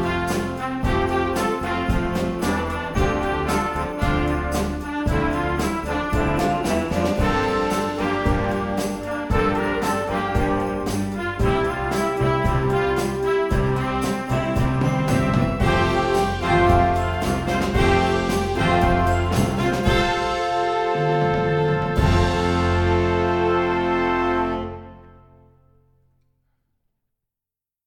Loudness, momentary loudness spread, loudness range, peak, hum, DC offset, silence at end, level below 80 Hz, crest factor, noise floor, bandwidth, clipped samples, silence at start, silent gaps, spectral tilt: -21 LUFS; 5 LU; 3 LU; -4 dBFS; none; under 0.1%; 2.75 s; -32 dBFS; 16 dB; -89 dBFS; 19 kHz; under 0.1%; 0 s; none; -6 dB/octave